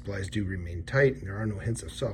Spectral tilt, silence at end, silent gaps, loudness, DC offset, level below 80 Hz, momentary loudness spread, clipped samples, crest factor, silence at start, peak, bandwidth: -6 dB/octave; 0 s; none; -30 LUFS; under 0.1%; -46 dBFS; 9 LU; under 0.1%; 18 dB; 0 s; -12 dBFS; 13.5 kHz